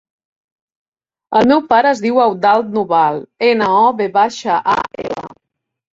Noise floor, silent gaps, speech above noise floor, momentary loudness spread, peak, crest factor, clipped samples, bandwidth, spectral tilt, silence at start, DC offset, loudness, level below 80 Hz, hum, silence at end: -76 dBFS; none; 63 dB; 7 LU; 0 dBFS; 14 dB; under 0.1%; 7.8 kHz; -5 dB/octave; 1.3 s; under 0.1%; -14 LUFS; -56 dBFS; none; 0.6 s